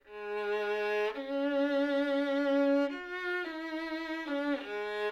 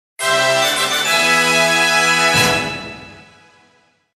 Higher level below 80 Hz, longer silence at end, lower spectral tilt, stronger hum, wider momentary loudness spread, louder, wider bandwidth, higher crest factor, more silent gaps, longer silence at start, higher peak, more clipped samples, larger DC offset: second, -70 dBFS vs -50 dBFS; second, 0 s vs 0.95 s; first, -4 dB/octave vs -1.5 dB/octave; neither; about the same, 8 LU vs 8 LU; second, -32 LUFS vs -13 LUFS; second, 9.4 kHz vs 15.5 kHz; about the same, 12 dB vs 16 dB; neither; second, 0.05 s vs 0.2 s; second, -20 dBFS vs -2 dBFS; neither; neither